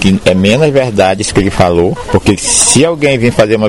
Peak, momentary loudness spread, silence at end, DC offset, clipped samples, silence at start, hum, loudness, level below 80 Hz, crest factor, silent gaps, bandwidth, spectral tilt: 0 dBFS; 5 LU; 0 s; 2%; 0.2%; 0 s; none; -9 LUFS; -30 dBFS; 10 dB; none; 16 kHz; -4 dB/octave